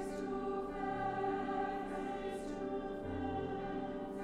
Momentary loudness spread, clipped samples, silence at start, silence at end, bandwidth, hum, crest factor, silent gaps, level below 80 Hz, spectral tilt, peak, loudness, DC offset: 4 LU; under 0.1%; 0 s; 0 s; 12.5 kHz; none; 12 dB; none; -56 dBFS; -6.5 dB/octave; -26 dBFS; -40 LUFS; under 0.1%